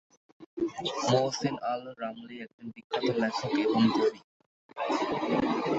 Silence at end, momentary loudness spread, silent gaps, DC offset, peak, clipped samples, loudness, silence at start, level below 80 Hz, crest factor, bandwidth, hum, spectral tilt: 0 s; 18 LU; 0.46-0.57 s, 2.53-2.58 s, 2.84-2.90 s, 4.24-4.40 s, 4.46-4.69 s; under 0.1%; -12 dBFS; under 0.1%; -30 LUFS; 0.4 s; -66 dBFS; 18 dB; 8 kHz; none; -5 dB/octave